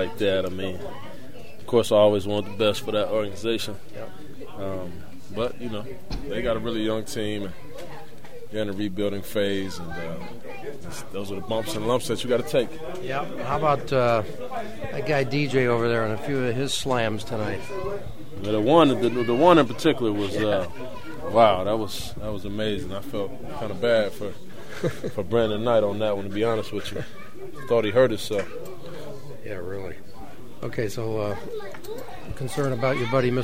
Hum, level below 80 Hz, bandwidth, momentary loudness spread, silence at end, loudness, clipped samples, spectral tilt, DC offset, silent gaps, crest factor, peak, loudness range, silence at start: none; -48 dBFS; 16 kHz; 19 LU; 0 s; -25 LUFS; under 0.1%; -5.5 dB/octave; 3%; none; 22 dB; -2 dBFS; 9 LU; 0 s